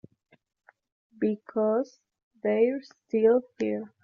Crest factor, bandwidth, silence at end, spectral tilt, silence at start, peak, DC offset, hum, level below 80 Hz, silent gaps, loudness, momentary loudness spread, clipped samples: 18 dB; 6.8 kHz; 0.15 s; -6.5 dB/octave; 1.2 s; -10 dBFS; under 0.1%; none; -74 dBFS; 2.23-2.31 s; -27 LUFS; 9 LU; under 0.1%